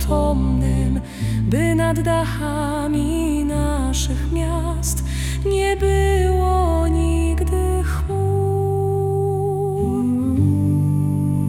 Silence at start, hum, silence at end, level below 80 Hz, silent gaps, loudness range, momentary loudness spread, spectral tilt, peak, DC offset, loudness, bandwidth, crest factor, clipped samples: 0 s; none; 0 s; -24 dBFS; none; 2 LU; 5 LU; -6.5 dB/octave; -6 dBFS; under 0.1%; -20 LUFS; 16 kHz; 12 dB; under 0.1%